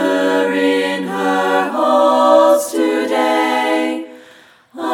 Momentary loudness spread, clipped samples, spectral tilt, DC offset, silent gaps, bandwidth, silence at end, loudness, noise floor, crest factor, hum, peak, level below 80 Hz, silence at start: 8 LU; under 0.1%; -4 dB/octave; under 0.1%; none; 17.5 kHz; 0 s; -14 LUFS; -45 dBFS; 14 dB; none; 0 dBFS; -66 dBFS; 0 s